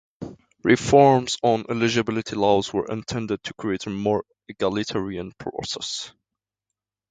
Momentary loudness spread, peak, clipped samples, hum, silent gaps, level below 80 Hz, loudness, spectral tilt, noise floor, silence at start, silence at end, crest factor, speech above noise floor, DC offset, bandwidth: 15 LU; -2 dBFS; under 0.1%; none; none; -54 dBFS; -23 LUFS; -5 dB/octave; -86 dBFS; 0.2 s; 1 s; 22 dB; 64 dB; under 0.1%; 9.4 kHz